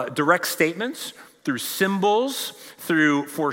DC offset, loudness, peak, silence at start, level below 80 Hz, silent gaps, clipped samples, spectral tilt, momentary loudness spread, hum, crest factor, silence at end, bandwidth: under 0.1%; -22 LUFS; -4 dBFS; 0 s; -78 dBFS; none; under 0.1%; -4 dB/octave; 13 LU; none; 20 dB; 0 s; 16.5 kHz